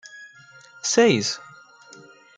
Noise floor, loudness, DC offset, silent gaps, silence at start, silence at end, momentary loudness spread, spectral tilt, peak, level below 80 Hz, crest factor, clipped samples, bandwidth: -49 dBFS; -20 LUFS; under 0.1%; none; 0.15 s; 0.95 s; 25 LU; -3.5 dB/octave; -4 dBFS; -72 dBFS; 20 dB; under 0.1%; 9.6 kHz